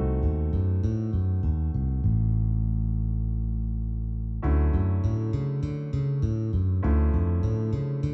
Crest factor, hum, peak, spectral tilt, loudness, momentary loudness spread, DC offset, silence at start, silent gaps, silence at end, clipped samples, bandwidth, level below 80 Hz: 12 dB; none; -14 dBFS; -10.5 dB/octave; -27 LUFS; 6 LU; under 0.1%; 0 s; none; 0 s; under 0.1%; 6 kHz; -28 dBFS